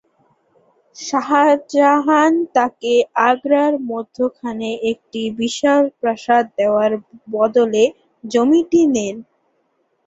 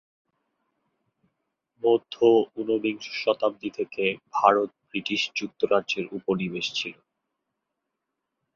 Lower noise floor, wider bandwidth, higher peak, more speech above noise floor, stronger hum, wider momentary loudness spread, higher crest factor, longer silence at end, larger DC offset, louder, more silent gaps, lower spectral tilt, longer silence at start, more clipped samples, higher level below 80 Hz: second, -65 dBFS vs -83 dBFS; about the same, 8 kHz vs 7.4 kHz; about the same, -2 dBFS vs -2 dBFS; second, 49 dB vs 58 dB; neither; about the same, 11 LU vs 10 LU; second, 16 dB vs 24 dB; second, 0.85 s vs 1.65 s; neither; first, -17 LUFS vs -25 LUFS; neither; about the same, -4 dB/octave vs -4.5 dB/octave; second, 1 s vs 1.85 s; neither; first, -62 dBFS vs -70 dBFS